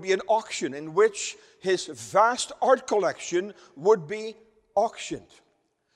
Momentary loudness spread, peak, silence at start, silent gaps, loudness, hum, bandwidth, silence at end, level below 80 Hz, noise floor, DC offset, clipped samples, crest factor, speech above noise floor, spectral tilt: 13 LU; -6 dBFS; 0 s; none; -26 LUFS; none; 12 kHz; 0.75 s; -70 dBFS; -71 dBFS; under 0.1%; under 0.1%; 20 dB; 45 dB; -3.5 dB/octave